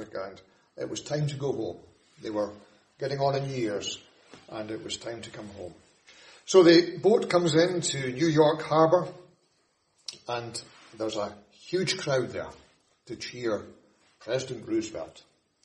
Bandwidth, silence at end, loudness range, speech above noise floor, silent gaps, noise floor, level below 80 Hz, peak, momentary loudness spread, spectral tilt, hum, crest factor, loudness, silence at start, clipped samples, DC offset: 11 kHz; 0.45 s; 11 LU; 44 dB; none; -71 dBFS; -66 dBFS; -6 dBFS; 20 LU; -5 dB/octave; none; 24 dB; -27 LUFS; 0 s; under 0.1%; under 0.1%